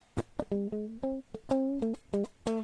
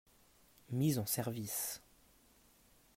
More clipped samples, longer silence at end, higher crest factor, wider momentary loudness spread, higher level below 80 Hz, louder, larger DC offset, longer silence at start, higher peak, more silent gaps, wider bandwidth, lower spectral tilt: neither; second, 0 s vs 1.2 s; about the same, 20 dB vs 18 dB; second, 6 LU vs 9 LU; first, -56 dBFS vs -72 dBFS; first, -35 LUFS vs -38 LUFS; neither; second, 0.15 s vs 0.7 s; first, -14 dBFS vs -22 dBFS; neither; second, 10.5 kHz vs 16 kHz; first, -7.5 dB/octave vs -5 dB/octave